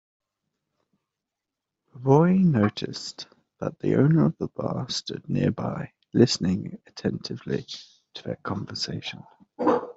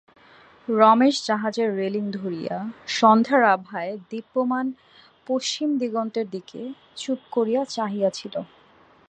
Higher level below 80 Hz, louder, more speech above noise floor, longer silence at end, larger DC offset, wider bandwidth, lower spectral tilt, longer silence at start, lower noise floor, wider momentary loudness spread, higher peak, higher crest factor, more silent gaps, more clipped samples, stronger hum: first, -62 dBFS vs -74 dBFS; about the same, -25 LUFS vs -23 LUFS; first, 62 dB vs 32 dB; second, 0.05 s vs 0.65 s; neither; second, 8 kHz vs 9.2 kHz; first, -6.5 dB/octave vs -4.5 dB/octave; first, 1.95 s vs 0.7 s; first, -86 dBFS vs -55 dBFS; about the same, 17 LU vs 17 LU; about the same, -4 dBFS vs -2 dBFS; about the same, 22 dB vs 22 dB; neither; neither; neither